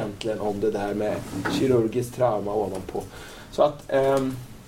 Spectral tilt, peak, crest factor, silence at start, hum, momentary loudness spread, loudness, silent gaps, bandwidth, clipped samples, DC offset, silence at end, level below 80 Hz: -6 dB/octave; -8 dBFS; 18 dB; 0 s; none; 12 LU; -25 LUFS; none; 16.5 kHz; under 0.1%; under 0.1%; 0 s; -48 dBFS